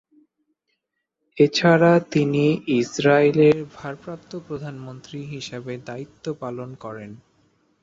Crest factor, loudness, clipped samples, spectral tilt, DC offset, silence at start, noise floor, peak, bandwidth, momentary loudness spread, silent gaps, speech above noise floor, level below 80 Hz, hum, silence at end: 18 dB; -19 LUFS; under 0.1%; -6 dB/octave; under 0.1%; 1.35 s; -78 dBFS; -4 dBFS; 7.8 kHz; 20 LU; none; 57 dB; -62 dBFS; none; 0.65 s